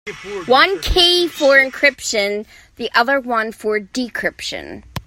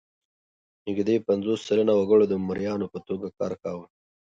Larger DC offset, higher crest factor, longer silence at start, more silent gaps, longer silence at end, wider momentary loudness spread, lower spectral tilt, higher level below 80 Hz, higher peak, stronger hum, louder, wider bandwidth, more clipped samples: neither; about the same, 18 dB vs 16 dB; second, 0.05 s vs 0.85 s; neither; second, 0.05 s vs 0.45 s; about the same, 16 LU vs 14 LU; second, -2.5 dB/octave vs -7 dB/octave; first, -36 dBFS vs -60 dBFS; first, 0 dBFS vs -8 dBFS; neither; first, -15 LUFS vs -25 LUFS; first, 16.5 kHz vs 7.8 kHz; neither